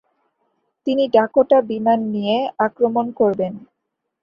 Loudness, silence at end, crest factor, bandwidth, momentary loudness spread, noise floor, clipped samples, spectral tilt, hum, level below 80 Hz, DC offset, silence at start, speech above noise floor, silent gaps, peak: -18 LUFS; 0.6 s; 18 dB; 5.6 kHz; 9 LU; -77 dBFS; under 0.1%; -8 dB/octave; none; -62 dBFS; under 0.1%; 0.85 s; 60 dB; none; -2 dBFS